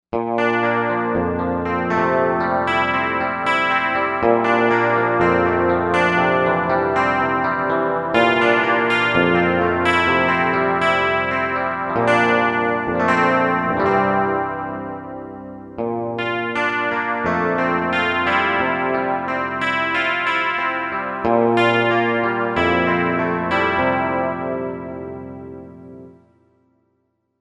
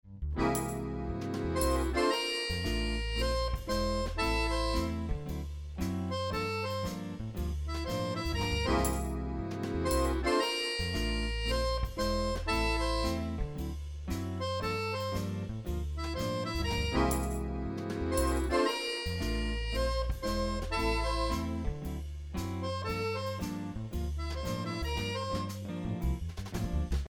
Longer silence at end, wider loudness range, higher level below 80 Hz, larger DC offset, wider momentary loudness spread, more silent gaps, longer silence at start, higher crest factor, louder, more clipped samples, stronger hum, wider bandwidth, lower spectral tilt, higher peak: first, 1.3 s vs 0 s; about the same, 5 LU vs 4 LU; second, -50 dBFS vs -38 dBFS; neither; about the same, 9 LU vs 8 LU; neither; about the same, 0.15 s vs 0.05 s; about the same, 18 dB vs 16 dB; first, -18 LUFS vs -33 LUFS; neither; neither; second, 10.5 kHz vs 18 kHz; first, -6.5 dB/octave vs -5 dB/octave; first, 0 dBFS vs -16 dBFS